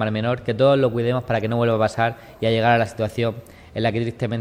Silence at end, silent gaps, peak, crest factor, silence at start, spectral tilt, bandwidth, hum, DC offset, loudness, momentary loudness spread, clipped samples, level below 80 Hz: 0 s; none; -4 dBFS; 16 dB; 0 s; -7 dB/octave; 12.5 kHz; none; under 0.1%; -21 LUFS; 8 LU; under 0.1%; -50 dBFS